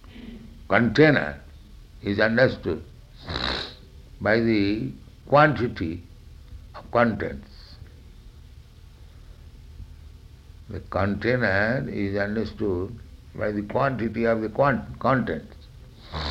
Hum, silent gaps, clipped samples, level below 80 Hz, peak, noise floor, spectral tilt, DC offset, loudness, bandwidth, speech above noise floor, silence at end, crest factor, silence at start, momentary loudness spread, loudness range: none; none; under 0.1%; -44 dBFS; -4 dBFS; -47 dBFS; -7.5 dB/octave; under 0.1%; -24 LUFS; 10.5 kHz; 24 dB; 0 s; 22 dB; 0.05 s; 25 LU; 7 LU